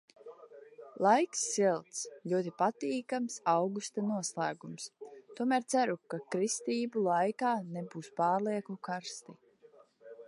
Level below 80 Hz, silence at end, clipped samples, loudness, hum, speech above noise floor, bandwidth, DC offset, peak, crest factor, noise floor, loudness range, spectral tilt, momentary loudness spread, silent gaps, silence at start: -88 dBFS; 0 s; under 0.1%; -33 LUFS; none; 29 dB; 11.5 kHz; under 0.1%; -12 dBFS; 20 dB; -62 dBFS; 3 LU; -4 dB/octave; 15 LU; none; 0.25 s